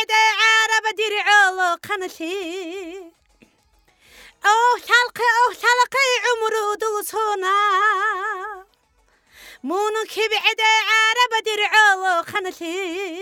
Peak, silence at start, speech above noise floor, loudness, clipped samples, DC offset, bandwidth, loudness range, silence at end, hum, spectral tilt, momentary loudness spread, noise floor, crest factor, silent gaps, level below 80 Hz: -2 dBFS; 0 s; 42 dB; -18 LUFS; under 0.1%; under 0.1%; 18 kHz; 5 LU; 0 s; none; 0.5 dB/octave; 13 LU; -61 dBFS; 18 dB; none; -68 dBFS